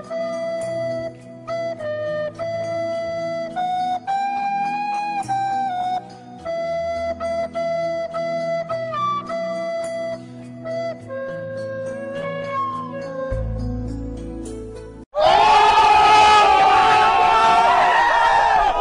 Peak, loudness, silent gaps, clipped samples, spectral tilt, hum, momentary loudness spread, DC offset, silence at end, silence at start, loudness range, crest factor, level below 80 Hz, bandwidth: -4 dBFS; -19 LUFS; 15.06-15.11 s; under 0.1%; -4 dB/octave; none; 17 LU; under 0.1%; 0 s; 0 s; 14 LU; 16 dB; -40 dBFS; 11 kHz